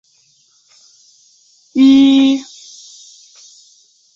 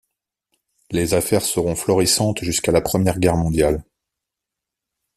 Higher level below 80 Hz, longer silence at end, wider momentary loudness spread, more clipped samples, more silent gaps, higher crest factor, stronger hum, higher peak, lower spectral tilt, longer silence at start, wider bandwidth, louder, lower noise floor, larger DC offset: second, -60 dBFS vs -40 dBFS; first, 1.7 s vs 1.35 s; first, 27 LU vs 4 LU; neither; neither; about the same, 14 dB vs 18 dB; neither; about the same, -2 dBFS vs -2 dBFS; about the same, -3.5 dB/octave vs -4.5 dB/octave; first, 1.75 s vs 0.9 s; second, 7.6 kHz vs 15 kHz; first, -11 LUFS vs -19 LUFS; second, -55 dBFS vs -84 dBFS; neither